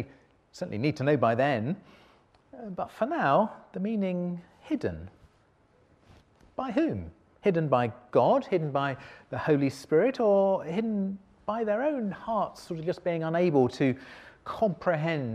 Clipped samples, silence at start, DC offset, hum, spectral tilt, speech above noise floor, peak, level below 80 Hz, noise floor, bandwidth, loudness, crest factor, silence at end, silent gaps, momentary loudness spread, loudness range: under 0.1%; 0 s; under 0.1%; none; -7.5 dB/octave; 37 dB; -10 dBFS; -62 dBFS; -64 dBFS; 12.5 kHz; -28 LUFS; 18 dB; 0 s; none; 15 LU; 7 LU